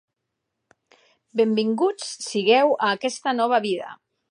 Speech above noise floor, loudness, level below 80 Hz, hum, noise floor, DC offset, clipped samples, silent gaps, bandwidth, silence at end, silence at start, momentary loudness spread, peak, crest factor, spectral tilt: 59 dB; -22 LUFS; -80 dBFS; none; -80 dBFS; under 0.1%; under 0.1%; none; 11 kHz; 0.35 s; 1.35 s; 12 LU; -6 dBFS; 18 dB; -4 dB/octave